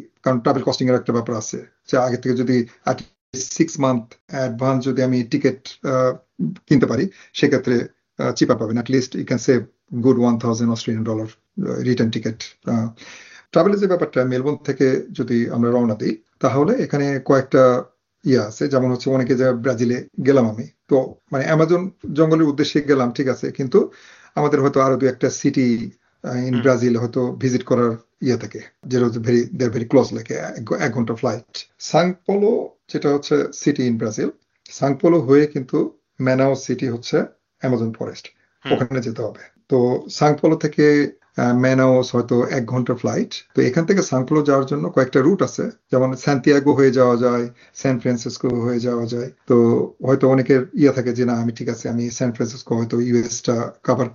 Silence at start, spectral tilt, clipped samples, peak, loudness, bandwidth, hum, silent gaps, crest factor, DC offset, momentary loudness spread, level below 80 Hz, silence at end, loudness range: 0 s; -6.5 dB/octave; under 0.1%; -2 dBFS; -19 LUFS; 7.4 kHz; none; 3.21-3.33 s, 4.21-4.28 s; 18 dB; under 0.1%; 11 LU; -60 dBFS; 0 s; 4 LU